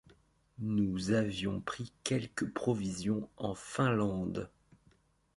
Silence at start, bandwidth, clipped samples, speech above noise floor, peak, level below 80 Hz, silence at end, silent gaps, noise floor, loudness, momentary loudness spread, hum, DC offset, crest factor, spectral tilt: 0.6 s; 11.5 kHz; under 0.1%; 35 dB; -16 dBFS; -60 dBFS; 0.9 s; none; -69 dBFS; -35 LUFS; 9 LU; none; under 0.1%; 20 dB; -6 dB/octave